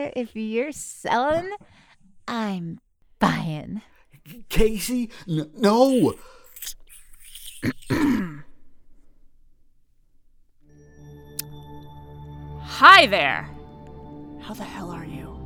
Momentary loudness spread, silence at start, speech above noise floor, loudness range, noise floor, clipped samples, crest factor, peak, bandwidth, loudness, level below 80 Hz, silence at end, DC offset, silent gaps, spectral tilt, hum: 24 LU; 0 s; 35 dB; 23 LU; -56 dBFS; under 0.1%; 24 dB; 0 dBFS; over 20 kHz; -20 LUFS; -42 dBFS; 0 s; under 0.1%; none; -4.5 dB/octave; none